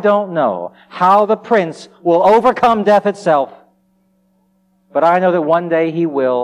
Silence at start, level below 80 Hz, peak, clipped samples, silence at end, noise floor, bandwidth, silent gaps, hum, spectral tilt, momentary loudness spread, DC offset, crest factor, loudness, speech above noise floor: 0 s; -58 dBFS; -2 dBFS; under 0.1%; 0 s; -58 dBFS; 10.5 kHz; none; none; -7 dB/octave; 11 LU; under 0.1%; 12 dB; -14 LUFS; 45 dB